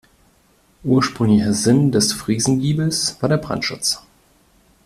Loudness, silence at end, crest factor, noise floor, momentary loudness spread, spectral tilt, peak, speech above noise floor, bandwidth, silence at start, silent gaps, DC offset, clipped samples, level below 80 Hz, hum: -18 LUFS; 0.85 s; 16 dB; -57 dBFS; 6 LU; -4.5 dB/octave; -4 dBFS; 39 dB; 15 kHz; 0.85 s; none; under 0.1%; under 0.1%; -50 dBFS; none